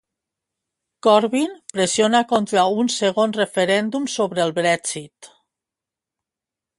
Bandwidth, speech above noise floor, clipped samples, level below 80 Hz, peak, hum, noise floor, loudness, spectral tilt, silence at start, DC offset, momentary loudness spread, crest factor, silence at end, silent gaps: 11.5 kHz; 68 dB; under 0.1%; -66 dBFS; -2 dBFS; none; -87 dBFS; -19 LUFS; -3.5 dB/octave; 1.05 s; under 0.1%; 7 LU; 20 dB; 1.55 s; none